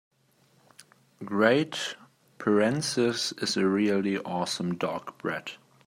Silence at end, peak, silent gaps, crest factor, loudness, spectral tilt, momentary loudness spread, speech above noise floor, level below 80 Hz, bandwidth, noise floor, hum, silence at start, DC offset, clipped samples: 0.3 s; -6 dBFS; none; 22 dB; -27 LUFS; -4.5 dB/octave; 12 LU; 38 dB; -74 dBFS; 16 kHz; -65 dBFS; none; 1.2 s; under 0.1%; under 0.1%